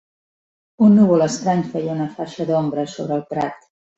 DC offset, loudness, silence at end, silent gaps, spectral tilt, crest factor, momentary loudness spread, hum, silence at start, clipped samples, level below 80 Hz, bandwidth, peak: under 0.1%; -19 LUFS; 0.4 s; none; -7 dB/octave; 16 dB; 12 LU; none; 0.8 s; under 0.1%; -60 dBFS; 8 kHz; -4 dBFS